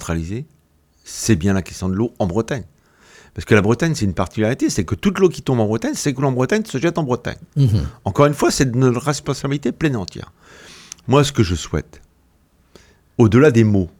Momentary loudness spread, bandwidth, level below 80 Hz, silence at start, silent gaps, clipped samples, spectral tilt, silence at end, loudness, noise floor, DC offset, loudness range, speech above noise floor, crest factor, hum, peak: 12 LU; 17 kHz; -40 dBFS; 0 s; none; under 0.1%; -6 dB/octave; 0.1 s; -18 LUFS; -57 dBFS; under 0.1%; 4 LU; 39 dB; 18 dB; none; 0 dBFS